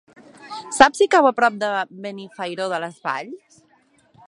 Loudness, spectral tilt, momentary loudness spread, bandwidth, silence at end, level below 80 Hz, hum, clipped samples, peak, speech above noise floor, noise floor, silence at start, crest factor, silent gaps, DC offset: -19 LUFS; -3 dB/octave; 18 LU; 11.5 kHz; 0.9 s; -58 dBFS; none; under 0.1%; 0 dBFS; 39 dB; -59 dBFS; 0.4 s; 22 dB; none; under 0.1%